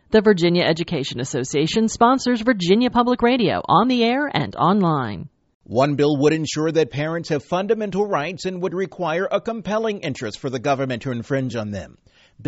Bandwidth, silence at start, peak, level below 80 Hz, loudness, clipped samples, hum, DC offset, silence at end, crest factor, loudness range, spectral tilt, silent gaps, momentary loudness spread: 8 kHz; 0.1 s; -2 dBFS; -52 dBFS; -20 LUFS; under 0.1%; none; under 0.1%; 0 s; 18 dB; 6 LU; -4.5 dB/octave; 5.54-5.60 s; 9 LU